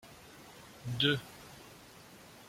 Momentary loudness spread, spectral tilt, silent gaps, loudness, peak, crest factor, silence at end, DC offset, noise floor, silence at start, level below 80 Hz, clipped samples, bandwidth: 23 LU; -4.5 dB/octave; none; -33 LUFS; -14 dBFS; 26 dB; 0 s; under 0.1%; -55 dBFS; 0.05 s; -68 dBFS; under 0.1%; 16.5 kHz